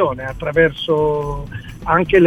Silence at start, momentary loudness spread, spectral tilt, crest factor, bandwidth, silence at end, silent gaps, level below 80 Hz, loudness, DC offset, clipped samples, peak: 0 s; 13 LU; -7.5 dB/octave; 16 dB; 13 kHz; 0 s; none; -36 dBFS; -18 LUFS; 0.1%; under 0.1%; 0 dBFS